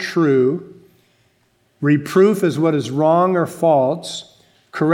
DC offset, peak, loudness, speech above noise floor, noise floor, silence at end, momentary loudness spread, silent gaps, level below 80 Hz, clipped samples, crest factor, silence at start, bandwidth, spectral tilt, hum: under 0.1%; -2 dBFS; -17 LUFS; 45 dB; -61 dBFS; 0 s; 13 LU; none; -68 dBFS; under 0.1%; 16 dB; 0 s; 16.5 kHz; -6.5 dB/octave; none